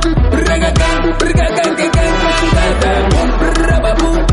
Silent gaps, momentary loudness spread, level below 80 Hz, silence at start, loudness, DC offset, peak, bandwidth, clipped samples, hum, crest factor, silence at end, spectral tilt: none; 2 LU; -14 dBFS; 0 s; -13 LUFS; under 0.1%; 0 dBFS; 11.5 kHz; under 0.1%; none; 10 dB; 0 s; -5.5 dB/octave